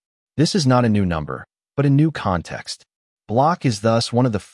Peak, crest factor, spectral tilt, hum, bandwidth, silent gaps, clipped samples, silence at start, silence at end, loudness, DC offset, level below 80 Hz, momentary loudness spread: -4 dBFS; 16 dB; -6 dB/octave; none; 12 kHz; 2.96-3.17 s; under 0.1%; 0.35 s; 0.1 s; -19 LUFS; under 0.1%; -50 dBFS; 15 LU